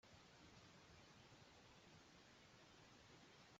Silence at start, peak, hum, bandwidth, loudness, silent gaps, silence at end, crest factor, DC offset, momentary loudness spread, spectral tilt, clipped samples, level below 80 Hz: 0.05 s; -54 dBFS; none; 7.6 kHz; -67 LUFS; none; 0 s; 14 dB; under 0.1%; 1 LU; -3 dB/octave; under 0.1%; -84 dBFS